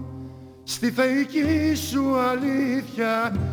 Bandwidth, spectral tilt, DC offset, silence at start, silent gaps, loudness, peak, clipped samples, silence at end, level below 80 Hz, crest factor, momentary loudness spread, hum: over 20 kHz; -5.5 dB/octave; under 0.1%; 0 s; none; -23 LUFS; -8 dBFS; under 0.1%; 0 s; -48 dBFS; 16 dB; 15 LU; none